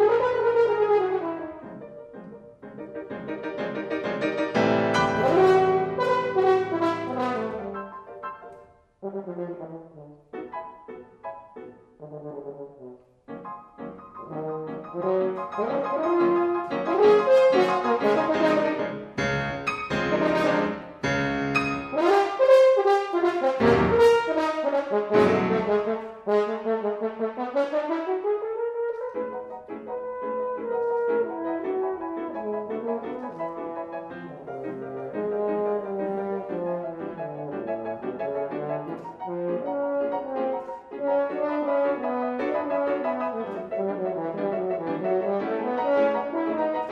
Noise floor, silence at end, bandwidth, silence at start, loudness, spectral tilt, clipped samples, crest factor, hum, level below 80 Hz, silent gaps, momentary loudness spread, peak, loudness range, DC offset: -51 dBFS; 0 s; 11.5 kHz; 0 s; -25 LUFS; -6.5 dB/octave; under 0.1%; 20 dB; none; -58 dBFS; none; 18 LU; -6 dBFS; 16 LU; under 0.1%